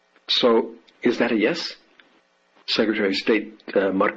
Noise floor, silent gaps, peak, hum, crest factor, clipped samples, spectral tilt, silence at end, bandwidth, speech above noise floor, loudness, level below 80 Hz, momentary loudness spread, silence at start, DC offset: -61 dBFS; none; -6 dBFS; none; 16 dB; under 0.1%; -4.5 dB/octave; 0 s; 7.8 kHz; 40 dB; -22 LUFS; -68 dBFS; 9 LU; 0.3 s; under 0.1%